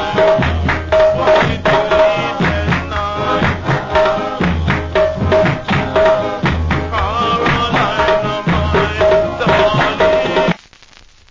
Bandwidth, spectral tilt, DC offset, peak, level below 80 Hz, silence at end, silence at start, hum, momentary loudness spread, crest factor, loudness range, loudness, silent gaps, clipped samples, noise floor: 7.6 kHz; -6.5 dB/octave; under 0.1%; -2 dBFS; -26 dBFS; 0.75 s; 0 s; none; 5 LU; 12 dB; 2 LU; -14 LUFS; none; under 0.1%; -43 dBFS